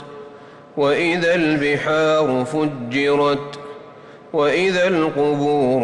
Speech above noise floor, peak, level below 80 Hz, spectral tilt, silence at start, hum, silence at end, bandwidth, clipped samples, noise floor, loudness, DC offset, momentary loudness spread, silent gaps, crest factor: 23 dB; -8 dBFS; -56 dBFS; -5.5 dB/octave; 0 s; none; 0 s; 11 kHz; under 0.1%; -41 dBFS; -18 LUFS; under 0.1%; 16 LU; none; 10 dB